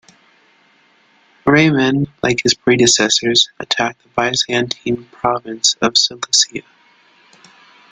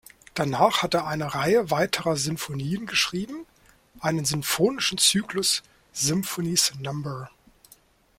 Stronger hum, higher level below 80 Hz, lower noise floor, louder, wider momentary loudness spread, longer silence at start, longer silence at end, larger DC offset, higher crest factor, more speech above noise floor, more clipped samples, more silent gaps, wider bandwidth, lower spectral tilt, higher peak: neither; first, -52 dBFS vs -58 dBFS; about the same, -54 dBFS vs -57 dBFS; first, -15 LUFS vs -24 LUFS; second, 8 LU vs 13 LU; first, 1.45 s vs 0.35 s; first, 1.3 s vs 0.9 s; neither; about the same, 18 dB vs 22 dB; first, 38 dB vs 33 dB; neither; neither; second, 9.6 kHz vs 16.5 kHz; about the same, -3 dB/octave vs -3 dB/octave; first, 0 dBFS vs -6 dBFS